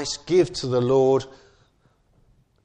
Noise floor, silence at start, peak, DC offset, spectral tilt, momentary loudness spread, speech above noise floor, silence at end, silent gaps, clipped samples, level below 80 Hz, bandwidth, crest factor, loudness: -62 dBFS; 0 s; -8 dBFS; under 0.1%; -5.5 dB/octave; 6 LU; 41 dB; 1.35 s; none; under 0.1%; -54 dBFS; 9.6 kHz; 16 dB; -21 LUFS